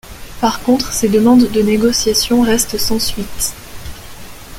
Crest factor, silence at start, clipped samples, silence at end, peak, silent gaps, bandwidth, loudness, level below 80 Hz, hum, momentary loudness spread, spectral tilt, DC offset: 14 dB; 0.05 s; under 0.1%; 0 s; 0 dBFS; none; 17 kHz; -14 LUFS; -34 dBFS; none; 22 LU; -3.5 dB/octave; under 0.1%